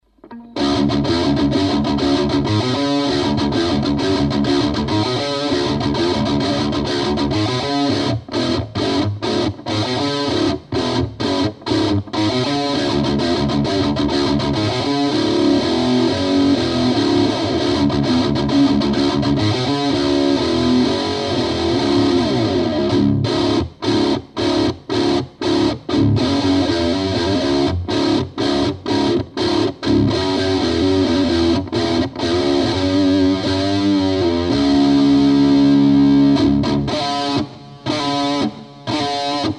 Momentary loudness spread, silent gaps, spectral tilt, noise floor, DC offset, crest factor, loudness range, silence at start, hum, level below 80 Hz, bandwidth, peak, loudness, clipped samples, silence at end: 5 LU; none; -6 dB/octave; -38 dBFS; under 0.1%; 12 dB; 4 LU; 0.25 s; none; -38 dBFS; 10.5 kHz; -4 dBFS; -17 LUFS; under 0.1%; 0 s